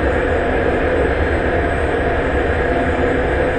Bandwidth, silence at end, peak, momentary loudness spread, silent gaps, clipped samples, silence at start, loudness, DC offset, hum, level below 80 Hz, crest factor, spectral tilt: 8.8 kHz; 0 s; -4 dBFS; 1 LU; none; under 0.1%; 0 s; -17 LUFS; under 0.1%; none; -24 dBFS; 12 dB; -7.5 dB/octave